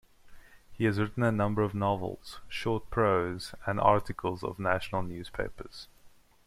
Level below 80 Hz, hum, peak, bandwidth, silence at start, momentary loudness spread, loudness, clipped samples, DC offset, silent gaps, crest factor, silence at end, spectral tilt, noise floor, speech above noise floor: -50 dBFS; none; -8 dBFS; 14.5 kHz; 0.25 s; 13 LU; -31 LUFS; under 0.1%; under 0.1%; none; 22 dB; 0.4 s; -7 dB/octave; -57 dBFS; 27 dB